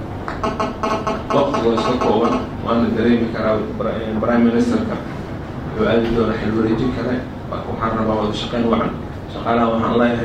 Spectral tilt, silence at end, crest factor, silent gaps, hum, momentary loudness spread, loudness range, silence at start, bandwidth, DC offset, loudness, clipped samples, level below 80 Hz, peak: -7 dB/octave; 0 s; 16 dB; none; none; 10 LU; 3 LU; 0 s; 9 kHz; under 0.1%; -19 LUFS; under 0.1%; -36 dBFS; -2 dBFS